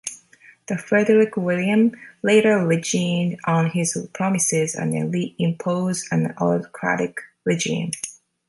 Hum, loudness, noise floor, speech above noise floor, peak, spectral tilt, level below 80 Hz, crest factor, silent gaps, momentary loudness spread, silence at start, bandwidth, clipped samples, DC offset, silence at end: none; -21 LUFS; -51 dBFS; 31 dB; -4 dBFS; -5 dB/octave; -64 dBFS; 16 dB; none; 10 LU; 0.05 s; 12 kHz; under 0.1%; under 0.1%; 0.35 s